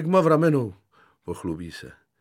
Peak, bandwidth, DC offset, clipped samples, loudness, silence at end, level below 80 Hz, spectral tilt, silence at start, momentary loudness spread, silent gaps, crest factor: -8 dBFS; 14.5 kHz; under 0.1%; under 0.1%; -23 LUFS; 0.3 s; -56 dBFS; -8 dB/octave; 0 s; 21 LU; none; 16 dB